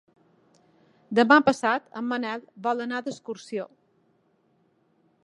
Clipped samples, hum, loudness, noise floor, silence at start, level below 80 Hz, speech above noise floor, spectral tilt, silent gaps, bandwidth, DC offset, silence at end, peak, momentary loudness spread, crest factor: under 0.1%; none; -25 LUFS; -67 dBFS; 1.1 s; -72 dBFS; 42 dB; -4.5 dB/octave; none; 11.5 kHz; under 0.1%; 1.6 s; -2 dBFS; 17 LU; 24 dB